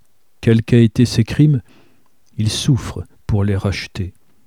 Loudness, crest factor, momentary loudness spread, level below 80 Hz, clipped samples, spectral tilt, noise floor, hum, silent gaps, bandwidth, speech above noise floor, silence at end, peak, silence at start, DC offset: -17 LUFS; 16 dB; 16 LU; -38 dBFS; under 0.1%; -6.5 dB/octave; -58 dBFS; none; none; 13.5 kHz; 43 dB; 0.35 s; 0 dBFS; 0.4 s; 0.4%